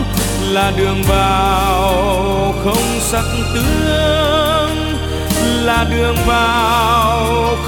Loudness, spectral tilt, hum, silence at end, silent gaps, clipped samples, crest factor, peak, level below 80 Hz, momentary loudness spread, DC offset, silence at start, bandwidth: -14 LUFS; -4.5 dB/octave; none; 0 s; none; under 0.1%; 14 dB; 0 dBFS; -22 dBFS; 4 LU; under 0.1%; 0 s; 19 kHz